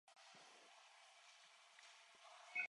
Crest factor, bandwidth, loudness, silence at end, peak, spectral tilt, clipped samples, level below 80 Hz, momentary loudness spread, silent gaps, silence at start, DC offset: 26 dB; 11 kHz; -61 LUFS; 0 s; -32 dBFS; 0.5 dB/octave; under 0.1%; under -90 dBFS; 2 LU; none; 0.05 s; under 0.1%